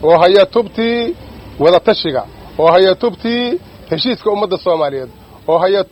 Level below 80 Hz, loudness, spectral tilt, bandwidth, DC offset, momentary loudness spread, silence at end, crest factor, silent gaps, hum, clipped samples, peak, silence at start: -44 dBFS; -14 LUFS; -6.5 dB/octave; 8.4 kHz; under 0.1%; 15 LU; 0.05 s; 14 dB; none; none; under 0.1%; 0 dBFS; 0 s